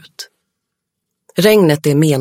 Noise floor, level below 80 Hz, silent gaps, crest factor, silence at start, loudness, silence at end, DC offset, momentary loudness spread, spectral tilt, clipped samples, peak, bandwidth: -77 dBFS; -58 dBFS; none; 16 dB; 0.2 s; -12 LUFS; 0 s; under 0.1%; 22 LU; -6 dB/octave; under 0.1%; 0 dBFS; 17 kHz